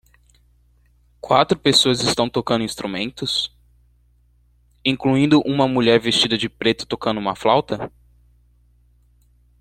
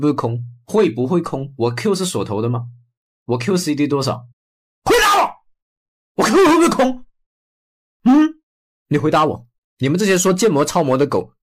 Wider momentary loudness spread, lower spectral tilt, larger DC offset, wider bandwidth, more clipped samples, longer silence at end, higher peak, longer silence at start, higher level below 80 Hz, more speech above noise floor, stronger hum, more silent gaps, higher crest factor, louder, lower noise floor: about the same, 10 LU vs 12 LU; about the same, -4.5 dB/octave vs -5 dB/octave; neither; about the same, 14.5 kHz vs 15.5 kHz; neither; first, 1.7 s vs 0.15 s; first, -2 dBFS vs -6 dBFS; first, 1.25 s vs 0 s; about the same, -52 dBFS vs -48 dBFS; second, 39 dB vs over 73 dB; first, 60 Hz at -45 dBFS vs none; second, none vs 2.97-3.26 s, 4.33-4.82 s, 5.62-6.15 s, 7.26-8.00 s, 8.43-8.86 s, 9.58-9.77 s; first, 20 dB vs 12 dB; about the same, -19 LUFS vs -17 LUFS; second, -57 dBFS vs under -90 dBFS